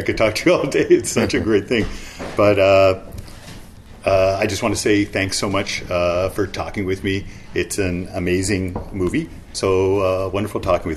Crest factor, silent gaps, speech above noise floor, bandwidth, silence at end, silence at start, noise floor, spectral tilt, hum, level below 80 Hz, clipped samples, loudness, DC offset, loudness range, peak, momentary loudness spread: 16 dB; none; 20 dB; 13.5 kHz; 0 s; 0 s; -38 dBFS; -5 dB/octave; none; -38 dBFS; under 0.1%; -19 LUFS; under 0.1%; 5 LU; -4 dBFS; 11 LU